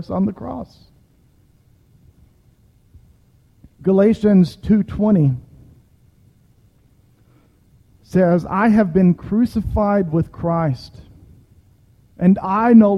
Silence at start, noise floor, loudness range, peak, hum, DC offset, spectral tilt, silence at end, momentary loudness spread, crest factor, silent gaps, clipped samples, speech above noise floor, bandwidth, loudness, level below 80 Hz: 0 s; -55 dBFS; 7 LU; -2 dBFS; none; under 0.1%; -9.5 dB/octave; 0 s; 10 LU; 18 dB; none; under 0.1%; 39 dB; 6.6 kHz; -17 LUFS; -40 dBFS